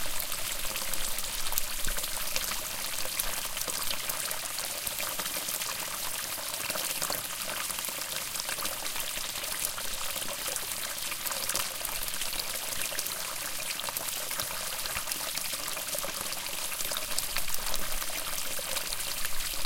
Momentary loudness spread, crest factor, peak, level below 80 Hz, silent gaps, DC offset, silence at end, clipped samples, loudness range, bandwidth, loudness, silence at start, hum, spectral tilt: 2 LU; 24 dB; -8 dBFS; -46 dBFS; none; under 0.1%; 0 s; under 0.1%; 1 LU; 17 kHz; -31 LUFS; 0 s; none; 0 dB/octave